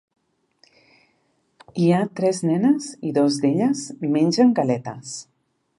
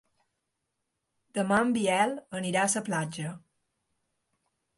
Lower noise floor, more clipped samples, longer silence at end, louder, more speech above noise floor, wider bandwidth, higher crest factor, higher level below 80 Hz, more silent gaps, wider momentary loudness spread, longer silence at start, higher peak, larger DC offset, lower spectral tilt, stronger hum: second, -67 dBFS vs -82 dBFS; neither; second, 0.55 s vs 1.4 s; first, -20 LUFS vs -28 LUFS; second, 47 dB vs 54 dB; about the same, 11.5 kHz vs 11.5 kHz; about the same, 18 dB vs 20 dB; about the same, -70 dBFS vs -70 dBFS; neither; first, 15 LU vs 11 LU; first, 1.75 s vs 1.35 s; first, -4 dBFS vs -12 dBFS; neither; first, -6 dB/octave vs -4 dB/octave; neither